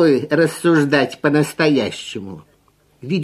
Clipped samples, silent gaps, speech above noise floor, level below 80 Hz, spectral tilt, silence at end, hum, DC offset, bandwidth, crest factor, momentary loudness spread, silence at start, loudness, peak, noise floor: under 0.1%; none; 40 dB; -60 dBFS; -6 dB/octave; 0 s; 50 Hz at -45 dBFS; under 0.1%; 13.5 kHz; 16 dB; 15 LU; 0 s; -17 LUFS; 0 dBFS; -57 dBFS